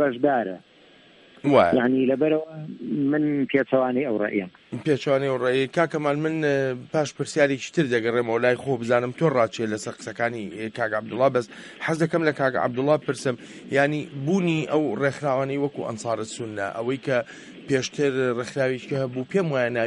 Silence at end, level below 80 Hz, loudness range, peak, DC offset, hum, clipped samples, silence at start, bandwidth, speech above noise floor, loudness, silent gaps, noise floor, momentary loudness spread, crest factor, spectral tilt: 0 s; -66 dBFS; 3 LU; -4 dBFS; under 0.1%; none; under 0.1%; 0 s; 11.5 kHz; 29 dB; -24 LUFS; none; -53 dBFS; 8 LU; 20 dB; -6 dB/octave